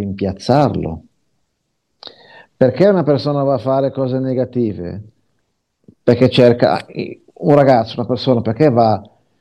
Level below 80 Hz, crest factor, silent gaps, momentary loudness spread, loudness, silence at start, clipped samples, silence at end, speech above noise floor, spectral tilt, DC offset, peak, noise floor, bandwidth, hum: -52 dBFS; 16 dB; none; 16 LU; -15 LUFS; 0 s; under 0.1%; 0.35 s; 56 dB; -8 dB/octave; under 0.1%; 0 dBFS; -70 dBFS; 10 kHz; none